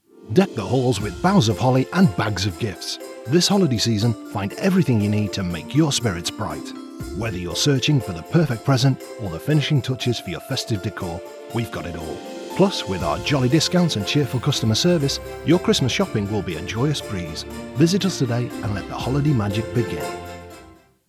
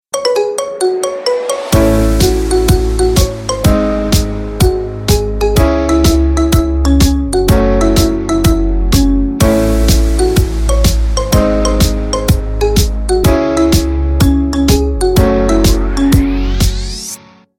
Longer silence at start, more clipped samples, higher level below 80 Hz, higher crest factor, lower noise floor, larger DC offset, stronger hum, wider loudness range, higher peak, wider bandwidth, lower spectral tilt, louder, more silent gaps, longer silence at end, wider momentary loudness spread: about the same, 0.15 s vs 0.15 s; neither; second, -46 dBFS vs -16 dBFS; first, 20 dB vs 10 dB; first, -48 dBFS vs -31 dBFS; neither; neither; first, 4 LU vs 1 LU; about the same, -2 dBFS vs 0 dBFS; about the same, 15 kHz vs 16.5 kHz; about the same, -5.5 dB/octave vs -5.5 dB/octave; second, -21 LUFS vs -12 LUFS; neither; about the same, 0.35 s vs 0.4 s; first, 12 LU vs 4 LU